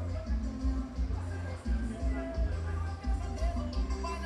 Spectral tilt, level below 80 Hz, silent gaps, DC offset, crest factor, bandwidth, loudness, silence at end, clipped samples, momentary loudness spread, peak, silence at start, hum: -7 dB/octave; -34 dBFS; none; under 0.1%; 12 dB; 10 kHz; -36 LUFS; 0 s; under 0.1%; 2 LU; -20 dBFS; 0 s; none